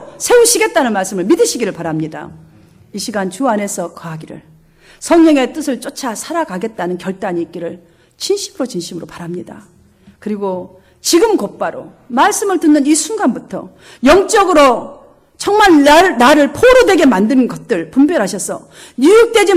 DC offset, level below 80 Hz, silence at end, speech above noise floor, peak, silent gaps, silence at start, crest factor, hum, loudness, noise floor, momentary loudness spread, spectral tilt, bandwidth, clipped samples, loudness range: under 0.1%; -42 dBFS; 0 s; 33 dB; 0 dBFS; none; 0 s; 14 dB; none; -12 LUFS; -45 dBFS; 18 LU; -3.5 dB/octave; 16 kHz; under 0.1%; 12 LU